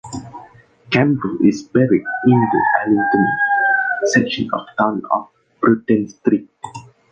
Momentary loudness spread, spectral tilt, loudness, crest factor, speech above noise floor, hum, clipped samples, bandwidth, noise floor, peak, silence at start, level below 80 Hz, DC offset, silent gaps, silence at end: 8 LU; -6 dB/octave; -17 LUFS; 16 dB; 28 dB; none; under 0.1%; 9.2 kHz; -45 dBFS; 0 dBFS; 0.05 s; -54 dBFS; under 0.1%; none; 0.3 s